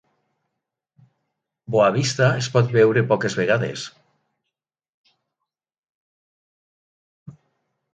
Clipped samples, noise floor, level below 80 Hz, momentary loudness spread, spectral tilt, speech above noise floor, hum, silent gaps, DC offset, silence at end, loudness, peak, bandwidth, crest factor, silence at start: under 0.1%; -84 dBFS; -64 dBFS; 10 LU; -5.5 dB/octave; 65 dB; none; 4.89-5.04 s, 5.78-5.83 s, 5.89-7.26 s; under 0.1%; 0.65 s; -19 LUFS; -4 dBFS; 9.2 kHz; 20 dB; 1.7 s